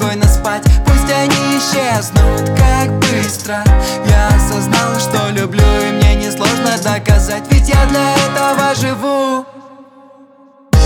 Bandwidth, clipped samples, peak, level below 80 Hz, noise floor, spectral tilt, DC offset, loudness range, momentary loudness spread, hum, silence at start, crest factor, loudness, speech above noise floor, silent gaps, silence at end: 18 kHz; under 0.1%; 0 dBFS; -16 dBFS; -43 dBFS; -5 dB/octave; under 0.1%; 1 LU; 4 LU; none; 0 s; 10 dB; -13 LUFS; 32 dB; none; 0 s